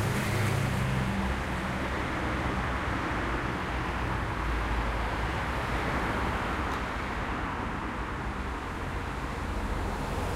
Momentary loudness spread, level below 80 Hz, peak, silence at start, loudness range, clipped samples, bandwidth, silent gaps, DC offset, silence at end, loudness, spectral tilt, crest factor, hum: 6 LU; -36 dBFS; -16 dBFS; 0 s; 3 LU; under 0.1%; 16 kHz; none; under 0.1%; 0 s; -31 LUFS; -5.5 dB/octave; 14 dB; none